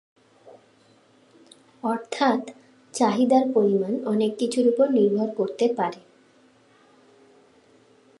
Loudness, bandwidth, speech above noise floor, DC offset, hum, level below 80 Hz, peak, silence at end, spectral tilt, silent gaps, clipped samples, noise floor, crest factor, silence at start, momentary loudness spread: -23 LUFS; 11.5 kHz; 36 dB; under 0.1%; none; -78 dBFS; -6 dBFS; 2.25 s; -5.5 dB/octave; none; under 0.1%; -58 dBFS; 18 dB; 0.45 s; 10 LU